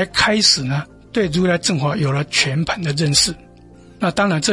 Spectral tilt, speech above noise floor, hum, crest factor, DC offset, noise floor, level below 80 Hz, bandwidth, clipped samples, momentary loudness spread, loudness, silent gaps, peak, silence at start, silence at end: -3.5 dB/octave; 26 dB; none; 18 dB; under 0.1%; -43 dBFS; -44 dBFS; 11.5 kHz; under 0.1%; 10 LU; -17 LUFS; none; 0 dBFS; 0 s; 0 s